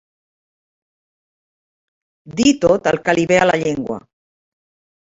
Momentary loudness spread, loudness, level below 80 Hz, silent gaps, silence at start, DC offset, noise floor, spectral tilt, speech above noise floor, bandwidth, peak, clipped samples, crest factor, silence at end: 14 LU; -16 LUFS; -52 dBFS; none; 2.25 s; under 0.1%; under -90 dBFS; -4.5 dB/octave; over 74 dB; 8 kHz; 0 dBFS; under 0.1%; 20 dB; 1.1 s